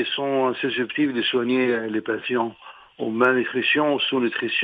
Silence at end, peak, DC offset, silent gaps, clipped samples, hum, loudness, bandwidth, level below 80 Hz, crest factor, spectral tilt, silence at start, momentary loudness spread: 0 s; -6 dBFS; under 0.1%; none; under 0.1%; none; -22 LUFS; 5 kHz; -68 dBFS; 18 dB; -7 dB/octave; 0 s; 6 LU